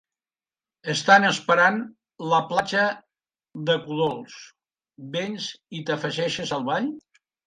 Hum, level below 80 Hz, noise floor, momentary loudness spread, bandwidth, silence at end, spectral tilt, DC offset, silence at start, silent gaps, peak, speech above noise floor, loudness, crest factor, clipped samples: none; -70 dBFS; under -90 dBFS; 20 LU; 11 kHz; 0.5 s; -4 dB/octave; under 0.1%; 0.85 s; none; -4 dBFS; over 67 dB; -23 LUFS; 22 dB; under 0.1%